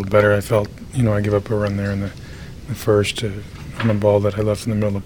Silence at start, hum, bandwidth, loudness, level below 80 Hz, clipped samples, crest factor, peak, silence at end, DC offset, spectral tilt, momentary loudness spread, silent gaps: 0 s; none; 18.5 kHz; -19 LUFS; -40 dBFS; under 0.1%; 18 dB; 0 dBFS; 0 s; under 0.1%; -6.5 dB/octave; 15 LU; none